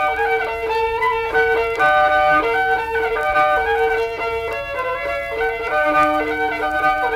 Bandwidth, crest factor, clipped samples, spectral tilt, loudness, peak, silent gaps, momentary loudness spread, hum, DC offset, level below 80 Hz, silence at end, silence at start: 16 kHz; 12 dB; under 0.1%; -4.5 dB/octave; -18 LUFS; -6 dBFS; none; 8 LU; none; under 0.1%; -42 dBFS; 0 s; 0 s